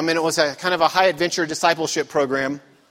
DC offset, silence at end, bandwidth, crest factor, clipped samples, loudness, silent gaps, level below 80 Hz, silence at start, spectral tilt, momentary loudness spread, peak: under 0.1%; 0.3 s; 16 kHz; 18 dB; under 0.1%; -20 LUFS; none; -62 dBFS; 0 s; -3 dB/octave; 6 LU; -2 dBFS